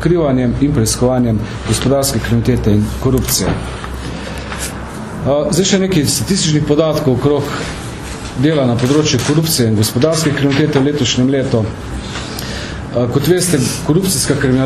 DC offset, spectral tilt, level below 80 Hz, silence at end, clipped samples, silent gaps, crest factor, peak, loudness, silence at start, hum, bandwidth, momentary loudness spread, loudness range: under 0.1%; -5 dB/octave; -30 dBFS; 0 s; under 0.1%; none; 14 dB; 0 dBFS; -14 LUFS; 0 s; none; 14 kHz; 11 LU; 3 LU